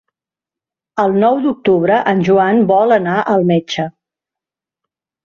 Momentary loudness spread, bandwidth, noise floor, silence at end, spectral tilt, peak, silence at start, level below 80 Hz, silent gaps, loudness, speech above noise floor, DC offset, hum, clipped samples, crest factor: 9 LU; 7 kHz; -88 dBFS; 1.35 s; -7 dB/octave; -2 dBFS; 0.95 s; -58 dBFS; none; -13 LUFS; 75 dB; under 0.1%; none; under 0.1%; 14 dB